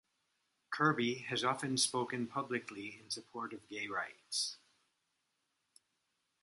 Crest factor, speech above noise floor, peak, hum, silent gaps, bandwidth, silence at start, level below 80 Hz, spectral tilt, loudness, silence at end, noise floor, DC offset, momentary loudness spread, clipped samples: 24 dB; 46 dB; -16 dBFS; none; none; 11.5 kHz; 0.7 s; -84 dBFS; -3 dB/octave; -37 LUFS; 1.85 s; -83 dBFS; under 0.1%; 12 LU; under 0.1%